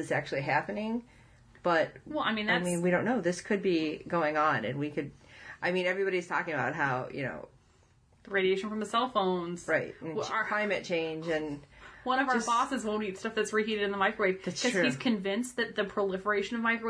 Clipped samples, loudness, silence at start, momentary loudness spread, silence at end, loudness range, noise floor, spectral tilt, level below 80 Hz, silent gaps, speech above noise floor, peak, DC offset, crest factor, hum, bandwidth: under 0.1%; -31 LUFS; 0 s; 8 LU; 0 s; 3 LU; -64 dBFS; -4.5 dB/octave; -66 dBFS; none; 33 dB; -14 dBFS; under 0.1%; 18 dB; none; 11 kHz